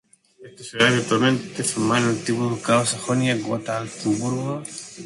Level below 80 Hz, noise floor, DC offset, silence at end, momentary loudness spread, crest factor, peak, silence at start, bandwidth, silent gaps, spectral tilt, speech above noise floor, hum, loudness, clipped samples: -60 dBFS; -47 dBFS; under 0.1%; 0 s; 10 LU; 20 dB; -2 dBFS; 0.4 s; 11.5 kHz; none; -4.5 dB/octave; 25 dB; none; -22 LUFS; under 0.1%